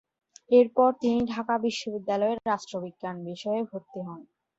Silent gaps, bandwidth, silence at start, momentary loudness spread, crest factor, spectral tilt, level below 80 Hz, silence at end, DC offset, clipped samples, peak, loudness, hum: none; 8 kHz; 0.5 s; 16 LU; 20 dB; -5.5 dB/octave; -68 dBFS; 0.35 s; under 0.1%; under 0.1%; -8 dBFS; -27 LUFS; none